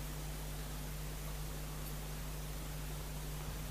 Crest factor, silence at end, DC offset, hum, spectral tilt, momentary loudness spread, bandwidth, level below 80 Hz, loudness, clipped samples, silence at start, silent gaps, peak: 12 dB; 0 s; under 0.1%; none; -4.5 dB/octave; 0 LU; 15.5 kHz; -46 dBFS; -45 LUFS; under 0.1%; 0 s; none; -30 dBFS